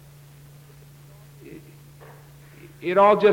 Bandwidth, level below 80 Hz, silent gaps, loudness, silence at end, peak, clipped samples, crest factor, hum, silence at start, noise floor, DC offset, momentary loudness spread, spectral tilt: 17 kHz; -60 dBFS; none; -19 LUFS; 0 s; -4 dBFS; under 0.1%; 20 dB; none; 1.5 s; -48 dBFS; under 0.1%; 30 LU; -6.5 dB/octave